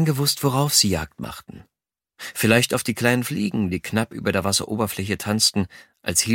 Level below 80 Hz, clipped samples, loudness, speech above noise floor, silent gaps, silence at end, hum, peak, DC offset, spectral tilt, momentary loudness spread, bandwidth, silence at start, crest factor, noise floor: -50 dBFS; under 0.1%; -21 LUFS; 41 dB; none; 0 s; none; 0 dBFS; under 0.1%; -3.5 dB/octave; 15 LU; 17 kHz; 0 s; 22 dB; -63 dBFS